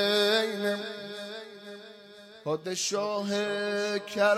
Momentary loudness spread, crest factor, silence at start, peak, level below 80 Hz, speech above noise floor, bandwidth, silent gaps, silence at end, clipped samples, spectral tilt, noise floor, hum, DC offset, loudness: 20 LU; 16 dB; 0 s; -14 dBFS; -80 dBFS; 21 dB; 16 kHz; none; 0 s; under 0.1%; -3 dB/octave; -50 dBFS; none; under 0.1%; -29 LUFS